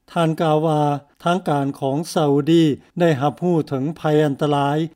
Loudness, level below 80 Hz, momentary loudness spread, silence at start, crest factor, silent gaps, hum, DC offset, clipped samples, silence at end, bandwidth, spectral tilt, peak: -19 LUFS; -62 dBFS; 6 LU; 0.1 s; 14 dB; none; none; under 0.1%; under 0.1%; 0.1 s; 16 kHz; -7 dB/octave; -6 dBFS